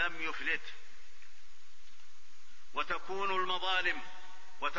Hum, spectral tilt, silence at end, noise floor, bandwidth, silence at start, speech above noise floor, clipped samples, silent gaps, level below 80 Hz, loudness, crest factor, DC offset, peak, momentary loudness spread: none; 0.5 dB/octave; 0 s; -61 dBFS; 7.2 kHz; 0 s; 26 dB; under 0.1%; none; -64 dBFS; -35 LUFS; 20 dB; 2%; -18 dBFS; 20 LU